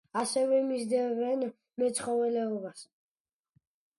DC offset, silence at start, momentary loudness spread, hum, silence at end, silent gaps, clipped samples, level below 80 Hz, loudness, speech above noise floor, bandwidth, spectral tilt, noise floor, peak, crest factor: under 0.1%; 0.15 s; 10 LU; none; 1.15 s; none; under 0.1%; -78 dBFS; -30 LUFS; over 60 dB; 11.5 kHz; -4 dB/octave; under -90 dBFS; -18 dBFS; 14 dB